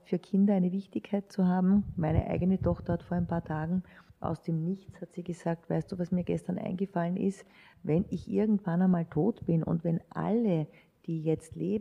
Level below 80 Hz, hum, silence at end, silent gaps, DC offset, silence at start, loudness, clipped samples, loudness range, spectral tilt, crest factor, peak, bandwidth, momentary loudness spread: -50 dBFS; none; 0 s; none; under 0.1%; 0.1 s; -31 LUFS; under 0.1%; 5 LU; -9.5 dB/octave; 16 dB; -16 dBFS; 10 kHz; 9 LU